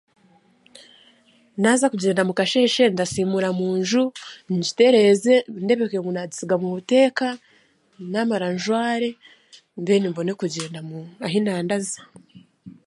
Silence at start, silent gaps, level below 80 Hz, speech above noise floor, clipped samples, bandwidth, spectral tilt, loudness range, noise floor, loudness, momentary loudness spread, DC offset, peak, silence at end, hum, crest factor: 1.55 s; none; -66 dBFS; 38 dB; under 0.1%; 11.5 kHz; -4.5 dB/octave; 6 LU; -59 dBFS; -21 LUFS; 14 LU; under 0.1%; -4 dBFS; 0.15 s; none; 18 dB